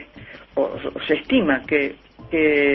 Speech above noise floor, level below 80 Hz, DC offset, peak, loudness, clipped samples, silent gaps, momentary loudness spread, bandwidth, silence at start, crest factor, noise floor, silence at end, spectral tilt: 23 dB; -50 dBFS; under 0.1%; -4 dBFS; -21 LUFS; under 0.1%; none; 11 LU; 5.6 kHz; 0 s; 16 dB; -42 dBFS; 0 s; -8 dB/octave